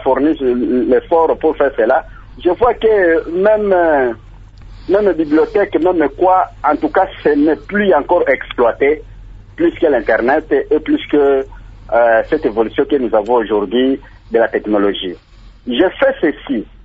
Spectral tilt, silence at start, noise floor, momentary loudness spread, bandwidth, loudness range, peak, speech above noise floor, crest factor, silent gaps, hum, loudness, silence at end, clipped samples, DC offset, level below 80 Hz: -8 dB/octave; 0 s; -35 dBFS; 6 LU; 5.4 kHz; 2 LU; 0 dBFS; 22 dB; 14 dB; none; none; -14 LUFS; 0.2 s; under 0.1%; under 0.1%; -38 dBFS